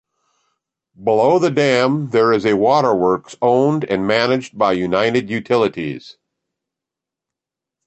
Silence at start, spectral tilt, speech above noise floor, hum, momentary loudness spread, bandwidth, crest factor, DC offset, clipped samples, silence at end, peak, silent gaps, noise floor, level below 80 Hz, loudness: 1 s; -6 dB/octave; 70 dB; none; 6 LU; 8.4 kHz; 16 dB; under 0.1%; under 0.1%; 1.75 s; -2 dBFS; none; -86 dBFS; -56 dBFS; -16 LUFS